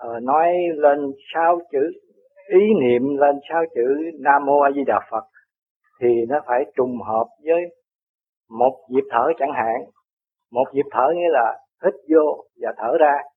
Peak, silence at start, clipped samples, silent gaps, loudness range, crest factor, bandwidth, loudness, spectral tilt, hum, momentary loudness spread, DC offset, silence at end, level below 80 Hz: -2 dBFS; 0 s; under 0.1%; 5.70-5.81 s, 7.95-8.18 s, 8.29-8.41 s, 10.13-10.17 s; 5 LU; 18 dB; 3.8 kHz; -20 LUFS; -9 dB/octave; none; 7 LU; under 0.1%; 0.1 s; -68 dBFS